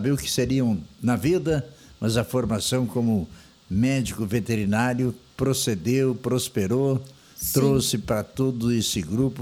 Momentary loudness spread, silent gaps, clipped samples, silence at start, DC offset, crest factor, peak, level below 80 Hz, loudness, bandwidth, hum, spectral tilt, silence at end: 5 LU; none; under 0.1%; 0 s; under 0.1%; 18 dB; -6 dBFS; -48 dBFS; -24 LUFS; 18 kHz; none; -5.5 dB/octave; 0 s